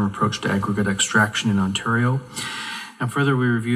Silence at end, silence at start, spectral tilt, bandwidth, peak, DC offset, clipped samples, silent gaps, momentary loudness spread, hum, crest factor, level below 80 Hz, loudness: 0 s; 0 s; -4.5 dB/octave; 16 kHz; -4 dBFS; under 0.1%; under 0.1%; none; 10 LU; none; 18 dB; -56 dBFS; -21 LUFS